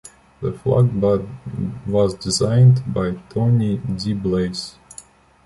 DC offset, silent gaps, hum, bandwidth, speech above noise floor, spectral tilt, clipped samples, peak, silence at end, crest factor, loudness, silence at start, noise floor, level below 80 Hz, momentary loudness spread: under 0.1%; none; none; 11.5 kHz; 26 dB; -7 dB/octave; under 0.1%; -4 dBFS; 0.45 s; 16 dB; -19 LUFS; 0.05 s; -45 dBFS; -44 dBFS; 16 LU